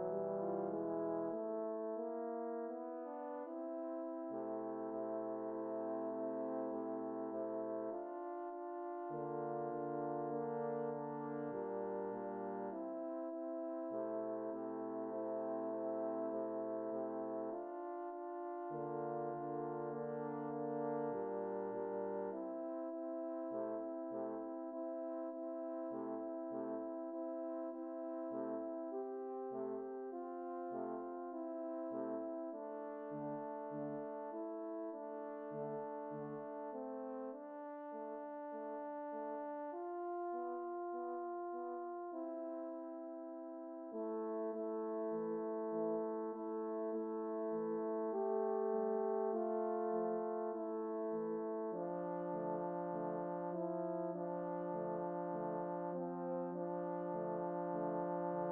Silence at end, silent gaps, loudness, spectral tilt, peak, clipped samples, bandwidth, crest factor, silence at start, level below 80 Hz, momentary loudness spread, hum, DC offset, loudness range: 0 s; none; -43 LUFS; -4.5 dB/octave; -28 dBFS; under 0.1%; 3.1 kHz; 16 dB; 0 s; under -90 dBFS; 6 LU; none; under 0.1%; 5 LU